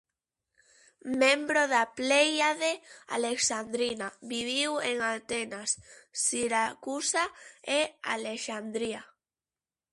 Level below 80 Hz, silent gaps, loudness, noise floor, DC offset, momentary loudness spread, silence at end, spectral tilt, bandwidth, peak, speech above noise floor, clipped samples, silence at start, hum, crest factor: -72 dBFS; none; -29 LUFS; under -90 dBFS; under 0.1%; 11 LU; 0.85 s; -1 dB/octave; 11.5 kHz; -10 dBFS; over 60 dB; under 0.1%; 1.05 s; none; 20 dB